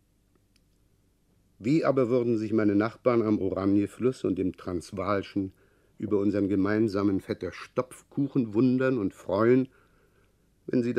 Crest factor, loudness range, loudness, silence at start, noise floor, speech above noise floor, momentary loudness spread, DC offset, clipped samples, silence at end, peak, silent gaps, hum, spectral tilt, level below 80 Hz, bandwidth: 18 dB; 3 LU; -27 LUFS; 1.6 s; -67 dBFS; 40 dB; 11 LU; under 0.1%; under 0.1%; 0 s; -10 dBFS; none; none; -8 dB/octave; -64 dBFS; 12 kHz